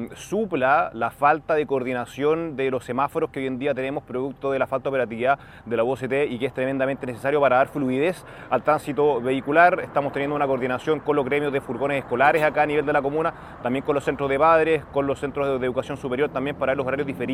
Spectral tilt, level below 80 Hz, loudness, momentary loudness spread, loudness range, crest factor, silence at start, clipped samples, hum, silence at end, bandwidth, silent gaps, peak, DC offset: -6.5 dB/octave; -54 dBFS; -23 LUFS; 8 LU; 4 LU; 20 dB; 0 s; under 0.1%; none; 0 s; 15 kHz; none; -2 dBFS; under 0.1%